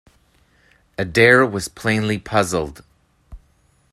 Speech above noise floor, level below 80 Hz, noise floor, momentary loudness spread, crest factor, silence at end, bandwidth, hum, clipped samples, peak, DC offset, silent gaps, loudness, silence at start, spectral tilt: 41 dB; -48 dBFS; -59 dBFS; 16 LU; 20 dB; 0.55 s; 14 kHz; none; under 0.1%; 0 dBFS; under 0.1%; none; -17 LUFS; 1 s; -5 dB/octave